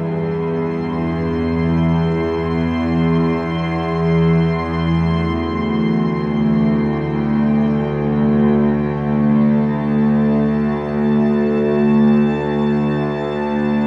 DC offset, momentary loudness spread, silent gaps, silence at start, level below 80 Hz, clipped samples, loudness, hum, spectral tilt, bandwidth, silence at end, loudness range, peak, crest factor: under 0.1%; 6 LU; none; 0 s; -36 dBFS; under 0.1%; -17 LUFS; none; -9.5 dB/octave; 5.6 kHz; 0 s; 2 LU; -4 dBFS; 12 dB